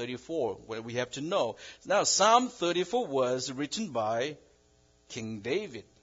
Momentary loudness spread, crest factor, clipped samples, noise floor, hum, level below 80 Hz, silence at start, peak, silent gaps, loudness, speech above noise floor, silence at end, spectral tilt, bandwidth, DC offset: 16 LU; 22 dB; under 0.1%; -65 dBFS; none; -70 dBFS; 0 s; -10 dBFS; none; -30 LUFS; 35 dB; 0.2 s; -3 dB/octave; 7.8 kHz; under 0.1%